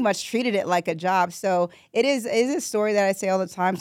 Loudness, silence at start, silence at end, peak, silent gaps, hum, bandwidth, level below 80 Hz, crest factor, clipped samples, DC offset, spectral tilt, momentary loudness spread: -23 LUFS; 0 s; 0 s; -10 dBFS; none; none; 16.5 kHz; -76 dBFS; 14 dB; under 0.1%; under 0.1%; -4.5 dB/octave; 3 LU